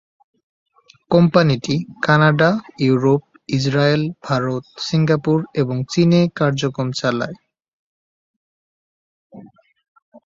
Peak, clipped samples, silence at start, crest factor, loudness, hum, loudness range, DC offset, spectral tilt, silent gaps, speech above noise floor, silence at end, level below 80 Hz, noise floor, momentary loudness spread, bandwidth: -2 dBFS; under 0.1%; 1.1 s; 18 dB; -18 LUFS; none; 10 LU; under 0.1%; -6.5 dB/octave; 7.68-9.30 s, 9.88-9.96 s, 10.02-10.12 s; 26 dB; 0.05 s; -54 dBFS; -43 dBFS; 8 LU; 7.6 kHz